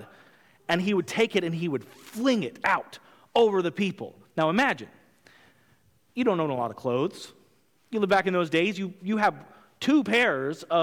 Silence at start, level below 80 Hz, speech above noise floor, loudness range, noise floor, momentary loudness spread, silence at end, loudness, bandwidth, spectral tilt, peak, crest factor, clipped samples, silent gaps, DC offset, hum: 0 s; -68 dBFS; 39 dB; 4 LU; -65 dBFS; 13 LU; 0 s; -26 LUFS; 17 kHz; -5.5 dB/octave; -10 dBFS; 18 dB; under 0.1%; none; under 0.1%; none